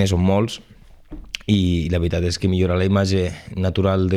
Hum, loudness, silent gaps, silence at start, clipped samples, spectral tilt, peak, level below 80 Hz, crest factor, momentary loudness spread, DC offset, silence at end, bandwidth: none; -20 LUFS; none; 0 s; under 0.1%; -6.5 dB/octave; -4 dBFS; -36 dBFS; 16 dB; 8 LU; under 0.1%; 0 s; 11.5 kHz